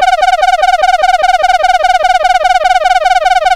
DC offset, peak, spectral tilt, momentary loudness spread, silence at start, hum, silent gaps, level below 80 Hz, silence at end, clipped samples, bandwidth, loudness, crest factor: under 0.1%; 0 dBFS; 0.5 dB/octave; 0 LU; 0 s; none; none; -32 dBFS; 0 s; under 0.1%; 13 kHz; -9 LUFS; 8 dB